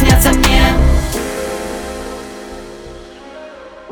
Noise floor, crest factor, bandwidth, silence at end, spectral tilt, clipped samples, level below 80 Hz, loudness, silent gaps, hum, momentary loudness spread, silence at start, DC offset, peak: -34 dBFS; 14 dB; over 20 kHz; 0 s; -4.5 dB/octave; under 0.1%; -18 dBFS; -14 LUFS; none; none; 23 LU; 0 s; under 0.1%; 0 dBFS